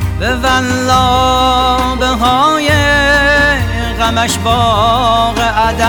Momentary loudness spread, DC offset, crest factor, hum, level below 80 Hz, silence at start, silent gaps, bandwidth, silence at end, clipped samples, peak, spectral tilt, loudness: 5 LU; under 0.1%; 10 dB; none; -22 dBFS; 0 s; none; 19.5 kHz; 0 s; under 0.1%; 0 dBFS; -4 dB/octave; -11 LUFS